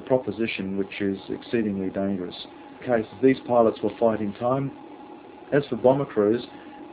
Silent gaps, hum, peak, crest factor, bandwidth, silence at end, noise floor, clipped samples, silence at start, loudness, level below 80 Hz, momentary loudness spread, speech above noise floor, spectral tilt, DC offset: none; none; -4 dBFS; 20 dB; 4 kHz; 0 s; -43 dBFS; under 0.1%; 0 s; -25 LUFS; -58 dBFS; 19 LU; 19 dB; -11 dB/octave; under 0.1%